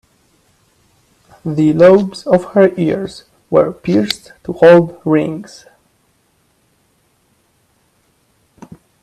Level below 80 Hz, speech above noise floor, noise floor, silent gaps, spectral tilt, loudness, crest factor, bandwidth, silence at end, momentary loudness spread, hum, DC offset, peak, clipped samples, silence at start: -54 dBFS; 46 dB; -59 dBFS; none; -7 dB/octave; -13 LUFS; 16 dB; 13 kHz; 3.6 s; 19 LU; none; under 0.1%; 0 dBFS; under 0.1%; 1.45 s